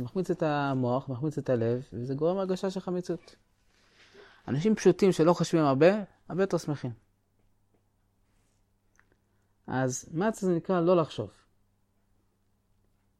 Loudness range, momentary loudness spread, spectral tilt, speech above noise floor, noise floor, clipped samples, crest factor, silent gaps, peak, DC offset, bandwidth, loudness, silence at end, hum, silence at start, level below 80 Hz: 11 LU; 13 LU; -6.5 dB/octave; 44 dB; -71 dBFS; under 0.1%; 20 dB; none; -10 dBFS; under 0.1%; 13.5 kHz; -28 LUFS; 1.9 s; none; 0 s; -64 dBFS